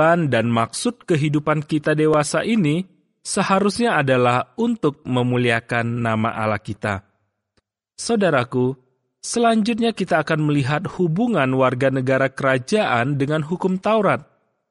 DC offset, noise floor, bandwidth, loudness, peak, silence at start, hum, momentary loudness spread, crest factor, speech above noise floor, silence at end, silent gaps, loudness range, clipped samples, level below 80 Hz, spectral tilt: under 0.1%; -69 dBFS; 11.5 kHz; -20 LUFS; -4 dBFS; 0 s; none; 7 LU; 16 dB; 50 dB; 0.5 s; none; 4 LU; under 0.1%; -56 dBFS; -5.5 dB/octave